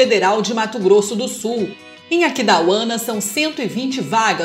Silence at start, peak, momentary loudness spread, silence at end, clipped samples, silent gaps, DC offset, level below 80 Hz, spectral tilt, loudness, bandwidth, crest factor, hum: 0 s; 0 dBFS; 8 LU; 0 s; under 0.1%; none; under 0.1%; -72 dBFS; -3.5 dB/octave; -17 LUFS; 16 kHz; 16 dB; none